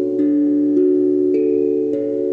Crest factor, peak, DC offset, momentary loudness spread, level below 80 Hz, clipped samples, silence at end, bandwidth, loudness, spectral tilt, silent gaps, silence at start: 10 dB; -6 dBFS; under 0.1%; 4 LU; -72 dBFS; under 0.1%; 0 s; 2.7 kHz; -17 LUFS; -10 dB/octave; none; 0 s